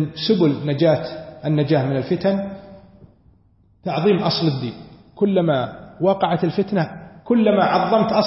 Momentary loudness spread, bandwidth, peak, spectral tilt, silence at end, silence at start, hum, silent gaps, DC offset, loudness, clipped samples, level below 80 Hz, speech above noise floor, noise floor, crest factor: 13 LU; 6 kHz; -4 dBFS; -10 dB/octave; 0 s; 0 s; none; none; under 0.1%; -19 LUFS; under 0.1%; -56 dBFS; 38 dB; -56 dBFS; 16 dB